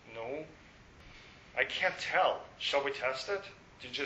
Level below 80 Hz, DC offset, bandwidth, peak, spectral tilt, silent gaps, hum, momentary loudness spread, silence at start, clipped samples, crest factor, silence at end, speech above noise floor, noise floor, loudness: -66 dBFS; under 0.1%; 8.2 kHz; -12 dBFS; -2.5 dB/octave; none; none; 23 LU; 0.05 s; under 0.1%; 24 dB; 0 s; 23 dB; -57 dBFS; -34 LUFS